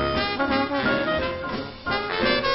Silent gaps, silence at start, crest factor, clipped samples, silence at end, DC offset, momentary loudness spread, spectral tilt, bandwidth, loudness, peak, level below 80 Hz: none; 0 s; 16 dB; under 0.1%; 0 s; under 0.1%; 7 LU; -9 dB/octave; 5.8 kHz; -24 LUFS; -8 dBFS; -42 dBFS